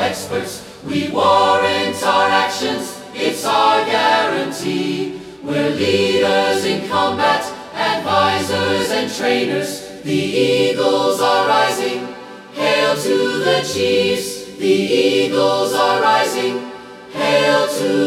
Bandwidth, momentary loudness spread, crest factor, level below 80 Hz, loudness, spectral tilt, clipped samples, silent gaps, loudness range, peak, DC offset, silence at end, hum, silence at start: 16.5 kHz; 10 LU; 16 dB; -58 dBFS; -16 LUFS; -3.5 dB/octave; under 0.1%; none; 2 LU; 0 dBFS; under 0.1%; 0 s; none; 0 s